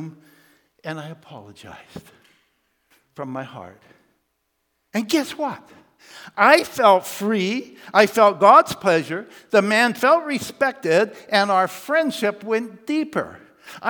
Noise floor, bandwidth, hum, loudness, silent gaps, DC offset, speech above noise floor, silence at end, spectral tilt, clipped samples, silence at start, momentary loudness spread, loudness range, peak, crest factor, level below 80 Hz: -73 dBFS; 19.5 kHz; none; -19 LUFS; none; under 0.1%; 53 dB; 0 s; -4 dB/octave; under 0.1%; 0 s; 21 LU; 22 LU; 0 dBFS; 20 dB; -68 dBFS